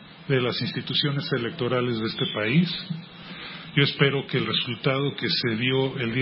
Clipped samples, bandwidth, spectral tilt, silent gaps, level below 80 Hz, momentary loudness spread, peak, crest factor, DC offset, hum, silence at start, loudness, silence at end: under 0.1%; 5.8 kHz; -10 dB/octave; none; -62 dBFS; 10 LU; -6 dBFS; 18 dB; under 0.1%; none; 0 s; -24 LUFS; 0 s